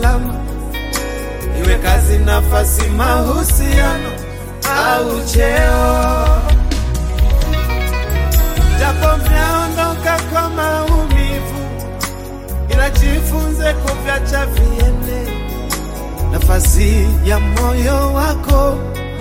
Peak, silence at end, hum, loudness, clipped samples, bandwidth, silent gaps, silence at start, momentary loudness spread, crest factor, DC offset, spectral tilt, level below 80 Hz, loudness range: 0 dBFS; 0 s; none; -15 LUFS; under 0.1%; 17 kHz; none; 0 s; 10 LU; 12 dB; under 0.1%; -5 dB/octave; -14 dBFS; 3 LU